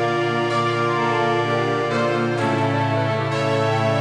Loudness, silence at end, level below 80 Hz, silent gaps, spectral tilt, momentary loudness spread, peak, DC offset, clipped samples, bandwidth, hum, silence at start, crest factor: -20 LUFS; 0 s; -70 dBFS; none; -6.5 dB/octave; 1 LU; -8 dBFS; 0.1%; under 0.1%; 11 kHz; none; 0 s; 12 dB